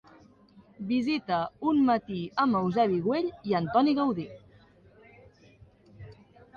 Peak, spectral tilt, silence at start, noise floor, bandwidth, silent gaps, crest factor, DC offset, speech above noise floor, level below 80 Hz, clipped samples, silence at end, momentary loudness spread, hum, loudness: -10 dBFS; -8 dB/octave; 0.8 s; -57 dBFS; 6.8 kHz; none; 18 dB; under 0.1%; 31 dB; -64 dBFS; under 0.1%; 0.45 s; 7 LU; none; -27 LUFS